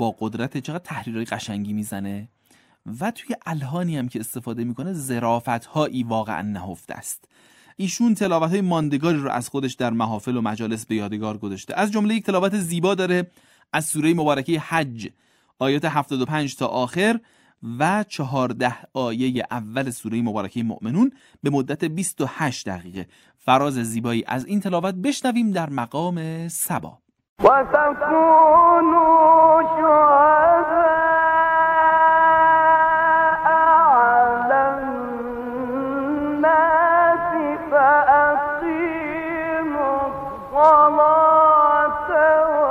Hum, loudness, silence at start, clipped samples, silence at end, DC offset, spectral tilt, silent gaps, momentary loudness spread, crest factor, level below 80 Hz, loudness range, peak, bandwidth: none; -19 LUFS; 0 s; under 0.1%; 0 s; under 0.1%; -5.5 dB/octave; 27.29-27.36 s; 15 LU; 16 dB; -54 dBFS; 11 LU; -2 dBFS; 16 kHz